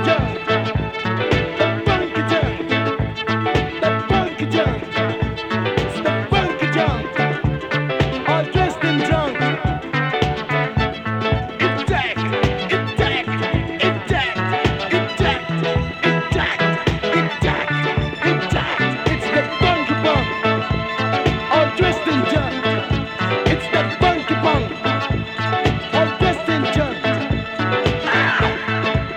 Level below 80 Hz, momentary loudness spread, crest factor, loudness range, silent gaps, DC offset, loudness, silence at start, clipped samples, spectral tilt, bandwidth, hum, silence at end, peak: -34 dBFS; 4 LU; 18 dB; 2 LU; none; under 0.1%; -19 LUFS; 0 s; under 0.1%; -6.5 dB/octave; 9.8 kHz; none; 0 s; 0 dBFS